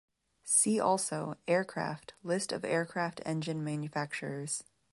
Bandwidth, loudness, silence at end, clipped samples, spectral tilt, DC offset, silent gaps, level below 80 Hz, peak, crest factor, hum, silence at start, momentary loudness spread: 11.5 kHz; -33 LUFS; 0.3 s; under 0.1%; -4 dB/octave; under 0.1%; none; -74 dBFS; -12 dBFS; 22 dB; none; 0.45 s; 11 LU